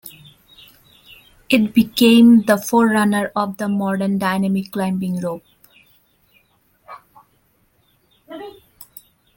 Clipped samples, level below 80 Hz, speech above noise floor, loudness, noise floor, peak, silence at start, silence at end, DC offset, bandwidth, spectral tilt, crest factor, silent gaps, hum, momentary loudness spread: under 0.1%; -58 dBFS; 45 dB; -16 LUFS; -61 dBFS; -2 dBFS; 0.05 s; 0.85 s; under 0.1%; 17 kHz; -5.5 dB/octave; 18 dB; none; none; 25 LU